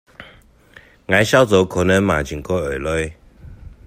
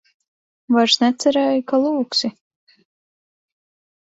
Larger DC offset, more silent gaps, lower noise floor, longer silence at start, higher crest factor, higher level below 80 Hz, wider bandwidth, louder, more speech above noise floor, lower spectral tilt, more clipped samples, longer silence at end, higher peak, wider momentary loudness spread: neither; neither; second, -48 dBFS vs under -90 dBFS; second, 0.2 s vs 0.7 s; about the same, 18 dB vs 18 dB; first, -40 dBFS vs -68 dBFS; first, 16 kHz vs 8.2 kHz; about the same, -17 LUFS vs -18 LUFS; second, 31 dB vs over 73 dB; first, -5 dB/octave vs -3 dB/octave; neither; second, 0.15 s vs 1.85 s; about the same, 0 dBFS vs -2 dBFS; first, 10 LU vs 5 LU